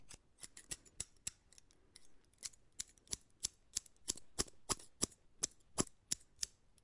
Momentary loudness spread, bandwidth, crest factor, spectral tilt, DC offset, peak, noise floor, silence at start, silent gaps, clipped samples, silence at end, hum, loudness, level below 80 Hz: 14 LU; 11.5 kHz; 32 dB; -1.5 dB/octave; under 0.1%; -16 dBFS; -68 dBFS; 0 s; none; under 0.1%; 0.3 s; none; -44 LUFS; -64 dBFS